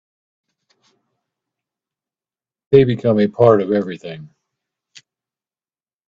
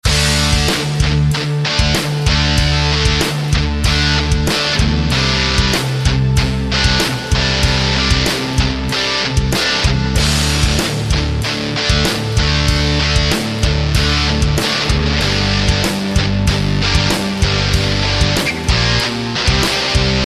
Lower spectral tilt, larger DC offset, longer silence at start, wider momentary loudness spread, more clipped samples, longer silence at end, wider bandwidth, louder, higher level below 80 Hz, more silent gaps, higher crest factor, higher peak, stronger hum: first, -9 dB/octave vs -4 dB/octave; neither; first, 2.7 s vs 0.05 s; first, 19 LU vs 3 LU; neither; first, 1.8 s vs 0 s; second, 7.4 kHz vs 14 kHz; about the same, -15 LUFS vs -14 LUFS; second, -56 dBFS vs -20 dBFS; neither; first, 20 dB vs 14 dB; about the same, 0 dBFS vs 0 dBFS; neither